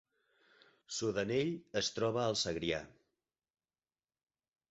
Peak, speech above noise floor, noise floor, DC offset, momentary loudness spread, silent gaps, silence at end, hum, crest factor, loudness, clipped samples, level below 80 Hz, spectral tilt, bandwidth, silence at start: -20 dBFS; over 54 dB; under -90 dBFS; under 0.1%; 5 LU; none; 1.8 s; none; 18 dB; -36 LUFS; under 0.1%; -66 dBFS; -3.5 dB/octave; 8 kHz; 0.9 s